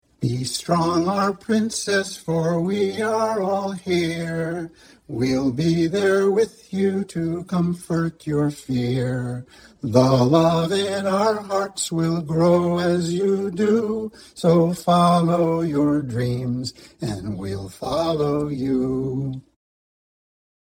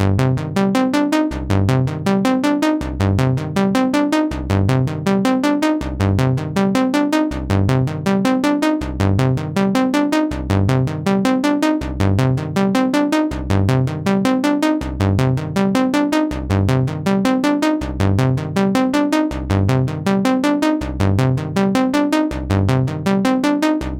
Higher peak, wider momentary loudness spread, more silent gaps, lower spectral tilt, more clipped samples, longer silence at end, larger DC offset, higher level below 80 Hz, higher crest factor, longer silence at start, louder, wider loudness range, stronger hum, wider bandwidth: first, 0 dBFS vs -4 dBFS; first, 11 LU vs 3 LU; neither; about the same, -6 dB/octave vs -7 dB/octave; neither; first, 1.2 s vs 0 s; neither; second, -52 dBFS vs -34 dBFS; first, 20 dB vs 12 dB; first, 0.2 s vs 0 s; second, -22 LUFS vs -17 LUFS; first, 5 LU vs 0 LU; neither; first, over 20 kHz vs 16.5 kHz